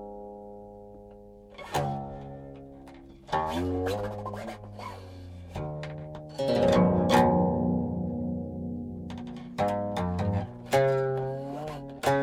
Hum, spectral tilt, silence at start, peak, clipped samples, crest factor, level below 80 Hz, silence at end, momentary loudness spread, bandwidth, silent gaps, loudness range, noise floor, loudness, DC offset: none; -7 dB/octave; 0 s; -6 dBFS; under 0.1%; 22 dB; -50 dBFS; 0 s; 23 LU; 17 kHz; none; 8 LU; -49 dBFS; -29 LUFS; under 0.1%